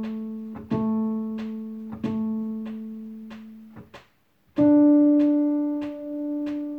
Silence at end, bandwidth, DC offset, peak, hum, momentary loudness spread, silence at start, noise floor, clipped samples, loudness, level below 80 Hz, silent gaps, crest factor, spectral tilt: 0 s; 4.3 kHz; under 0.1%; -10 dBFS; none; 20 LU; 0 s; -64 dBFS; under 0.1%; -24 LUFS; -62 dBFS; none; 16 dB; -9.5 dB/octave